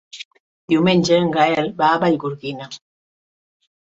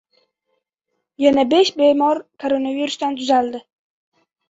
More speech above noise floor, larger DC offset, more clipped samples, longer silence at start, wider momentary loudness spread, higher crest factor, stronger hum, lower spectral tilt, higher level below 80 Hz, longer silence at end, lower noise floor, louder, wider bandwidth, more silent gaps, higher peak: first, over 73 dB vs 59 dB; neither; neither; second, 0.15 s vs 1.2 s; first, 21 LU vs 9 LU; about the same, 18 dB vs 18 dB; neither; first, -5.5 dB/octave vs -3.5 dB/octave; about the same, -60 dBFS vs -62 dBFS; first, 1.2 s vs 0.9 s; first, under -90 dBFS vs -76 dBFS; about the same, -18 LUFS vs -18 LUFS; about the same, 8 kHz vs 8 kHz; first, 0.25-0.31 s, 0.40-0.68 s vs none; about the same, -2 dBFS vs -2 dBFS